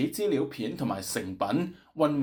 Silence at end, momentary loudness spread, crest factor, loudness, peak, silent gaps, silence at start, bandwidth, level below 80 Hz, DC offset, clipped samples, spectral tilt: 0 s; 5 LU; 16 dB; -30 LUFS; -12 dBFS; none; 0 s; over 20 kHz; -64 dBFS; under 0.1%; under 0.1%; -5.5 dB/octave